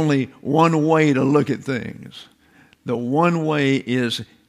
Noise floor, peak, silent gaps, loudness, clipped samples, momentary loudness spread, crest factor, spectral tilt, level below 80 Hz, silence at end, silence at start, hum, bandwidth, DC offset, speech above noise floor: -54 dBFS; -4 dBFS; none; -19 LUFS; under 0.1%; 14 LU; 16 dB; -6.5 dB/octave; -62 dBFS; 0.25 s; 0 s; none; 13 kHz; under 0.1%; 35 dB